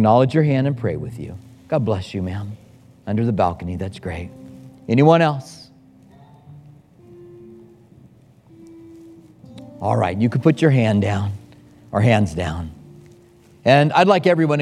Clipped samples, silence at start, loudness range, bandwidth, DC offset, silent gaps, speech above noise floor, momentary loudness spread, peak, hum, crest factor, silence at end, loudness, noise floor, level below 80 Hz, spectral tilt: under 0.1%; 0 s; 6 LU; 11.5 kHz; under 0.1%; none; 32 dB; 22 LU; 0 dBFS; none; 20 dB; 0 s; -19 LUFS; -49 dBFS; -48 dBFS; -7.5 dB/octave